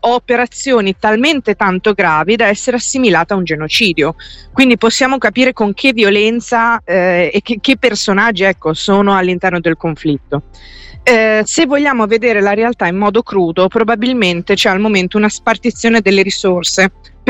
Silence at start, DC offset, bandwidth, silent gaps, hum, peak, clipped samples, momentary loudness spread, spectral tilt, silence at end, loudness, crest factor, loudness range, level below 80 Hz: 0.05 s; under 0.1%; 15.5 kHz; none; none; 0 dBFS; under 0.1%; 5 LU; -4 dB/octave; 0 s; -12 LUFS; 12 dB; 2 LU; -42 dBFS